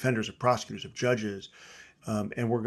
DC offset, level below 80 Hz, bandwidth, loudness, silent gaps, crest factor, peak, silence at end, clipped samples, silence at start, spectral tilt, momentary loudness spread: under 0.1%; -64 dBFS; 12.5 kHz; -30 LUFS; none; 20 dB; -10 dBFS; 0 s; under 0.1%; 0 s; -5.5 dB/octave; 18 LU